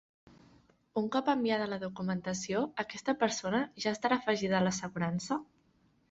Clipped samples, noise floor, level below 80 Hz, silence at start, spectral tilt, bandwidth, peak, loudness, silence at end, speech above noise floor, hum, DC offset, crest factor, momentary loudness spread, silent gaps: under 0.1%; -70 dBFS; -70 dBFS; 0.95 s; -4.5 dB/octave; 8.2 kHz; -14 dBFS; -33 LUFS; 0.65 s; 37 dB; none; under 0.1%; 20 dB; 6 LU; none